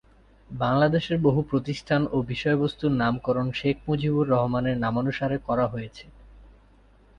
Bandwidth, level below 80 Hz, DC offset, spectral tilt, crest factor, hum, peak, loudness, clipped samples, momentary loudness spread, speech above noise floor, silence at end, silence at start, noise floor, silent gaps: 9.2 kHz; -50 dBFS; under 0.1%; -8 dB/octave; 18 dB; none; -8 dBFS; -25 LUFS; under 0.1%; 6 LU; 31 dB; 0.7 s; 0.5 s; -56 dBFS; none